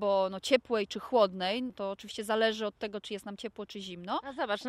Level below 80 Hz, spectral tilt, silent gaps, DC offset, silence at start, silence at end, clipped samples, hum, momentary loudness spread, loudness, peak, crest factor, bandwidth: -68 dBFS; -4 dB/octave; none; under 0.1%; 0 s; 0 s; under 0.1%; none; 13 LU; -32 LUFS; -12 dBFS; 20 dB; 15.5 kHz